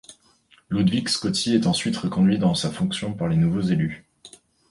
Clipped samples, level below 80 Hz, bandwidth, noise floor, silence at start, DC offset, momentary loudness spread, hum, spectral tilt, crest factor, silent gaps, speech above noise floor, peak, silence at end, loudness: under 0.1%; -50 dBFS; 11.5 kHz; -58 dBFS; 0.1 s; under 0.1%; 6 LU; none; -5.5 dB/octave; 16 dB; none; 37 dB; -6 dBFS; 0.4 s; -22 LUFS